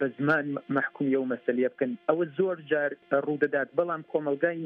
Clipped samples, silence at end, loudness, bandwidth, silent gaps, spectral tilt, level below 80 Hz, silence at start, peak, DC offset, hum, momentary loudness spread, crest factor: under 0.1%; 0 s; -28 LUFS; 5.6 kHz; none; -9 dB/octave; -80 dBFS; 0 s; -10 dBFS; under 0.1%; none; 3 LU; 18 dB